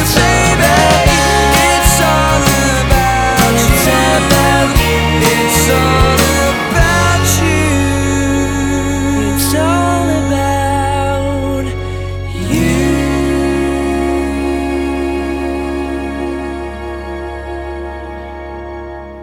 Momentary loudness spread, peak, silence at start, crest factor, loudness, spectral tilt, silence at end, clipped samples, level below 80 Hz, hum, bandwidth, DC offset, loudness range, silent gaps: 14 LU; 0 dBFS; 0 s; 12 dB; -12 LUFS; -4.5 dB/octave; 0 s; under 0.1%; -22 dBFS; none; 19.5 kHz; under 0.1%; 9 LU; none